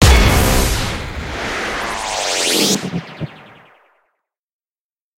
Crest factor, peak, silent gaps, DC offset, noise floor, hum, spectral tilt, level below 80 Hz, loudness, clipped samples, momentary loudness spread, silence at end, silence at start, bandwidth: 18 dB; 0 dBFS; none; under 0.1%; under -90 dBFS; none; -3.5 dB/octave; -22 dBFS; -17 LUFS; under 0.1%; 13 LU; 1.75 s; 0 s; 16 kHz